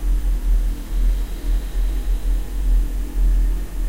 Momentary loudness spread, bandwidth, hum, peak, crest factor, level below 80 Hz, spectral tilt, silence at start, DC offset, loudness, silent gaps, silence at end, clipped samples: 4 LU; 15.5 kHz; none; -8 dBFS; 10 dB; -18 dBFS; -6 dB/octave; 0 s; under 0.1%; -24 LUFS; none; 0 s; under 0.1%